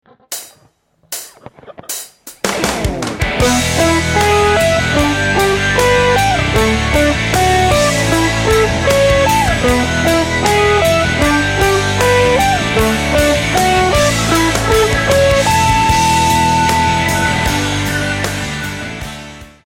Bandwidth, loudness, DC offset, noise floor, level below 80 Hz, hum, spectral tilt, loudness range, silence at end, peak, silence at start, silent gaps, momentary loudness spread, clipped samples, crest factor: 17 kHz; -12 LUFS; under 0.1%; -54 dBFS; -26 dBFS; none; -4 dB/octave; 4 LU; 0.2 s; 0 dBFS; 0.3 s; none; 13 LU; under 0.1%; 14 dB